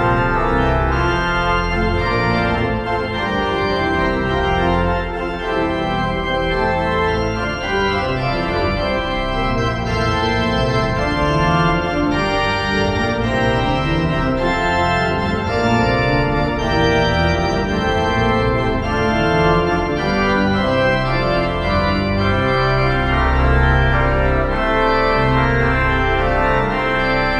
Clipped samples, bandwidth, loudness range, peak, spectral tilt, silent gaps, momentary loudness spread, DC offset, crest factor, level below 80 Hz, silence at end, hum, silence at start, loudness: under 0.1%; 10 kHz; 3 LU; -2 dBFS; -6.5 dB/octave; none; 4 LU; under 0.1%; 14 dB; -26 dBFS; 0 s; none; 0 s; -17 LUFS